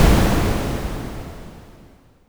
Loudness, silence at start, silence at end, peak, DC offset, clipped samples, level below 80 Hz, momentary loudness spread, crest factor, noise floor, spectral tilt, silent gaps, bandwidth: -21 LUFS; 0 s; 0.55 s; 0 dBFS; under 0.1%; under 0.1%; -24 dBFS; 22 LU; 20 dB; -49 dBFS; -5.5 dB/octave; none; over 20 kHz